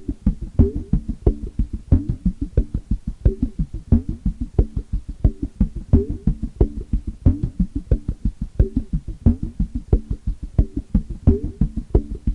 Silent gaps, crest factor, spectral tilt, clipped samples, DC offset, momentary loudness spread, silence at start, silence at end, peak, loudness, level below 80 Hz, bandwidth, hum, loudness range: none; 18 dB; -11 dB/octave; under 0.1%; under 0.1%; 8 LU; 0 s; 0 s; -2 dBFS; -23 LUFS; -24 dBFS; 2.7 kHz; none; 1 LU